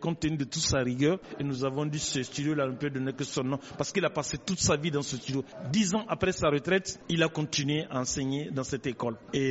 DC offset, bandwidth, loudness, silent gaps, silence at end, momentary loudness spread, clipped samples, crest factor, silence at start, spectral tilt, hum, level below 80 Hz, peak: under 0.1%; 8 kHz; -30 LUFS; none; 0 s; 7 LU; under 0.1%; 20 dB; 0 s; -4.5 dB/octave; none; -54 dBFS; -10 dBFS